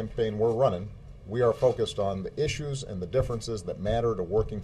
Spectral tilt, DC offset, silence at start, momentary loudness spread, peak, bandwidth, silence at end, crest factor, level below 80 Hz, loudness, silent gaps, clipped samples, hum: -6 dB/octave; under 0.1%; 0 s; 10 LU; -10 dBFS; 12 kHz; 0 s; 18 dB; -44 dBFS; -28 LUFS; none; under 0.1%; none